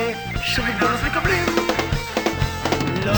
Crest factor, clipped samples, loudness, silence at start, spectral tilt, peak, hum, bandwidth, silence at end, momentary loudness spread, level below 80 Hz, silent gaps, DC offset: 16 dB; under 0.1%; -21 LUFS; 0 s; -4.5 dB/octave; -4 dBFS; none; over 20 kHz; 0 s; 4 LU; -34 dBFS; none; 0.1%